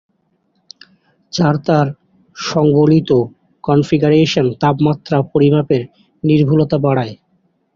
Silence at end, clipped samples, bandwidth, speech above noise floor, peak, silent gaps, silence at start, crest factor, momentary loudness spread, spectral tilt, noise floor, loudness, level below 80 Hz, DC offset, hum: 0.6 s; under 0.1%; 7.4 kHz; 49 dB; -2 dBFS; none; 1.35 s; 14 dB; 10 LU; -7.5 dB/octave; -63 dBFS; -14 LUFS; -50 dBFS; under 0.1%; none